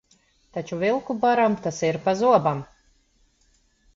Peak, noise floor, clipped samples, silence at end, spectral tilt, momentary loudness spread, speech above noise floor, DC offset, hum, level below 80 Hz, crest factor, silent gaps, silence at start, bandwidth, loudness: -4 dBFS; -63 dBFS; under 0.1%; 1.3 s; -6 dB/octave; 14 LU; 41 dB; under 0.1%; none; -60 dBFS; 20 dB; none; 0.55 s; 7.6 kHz; -23 LUFS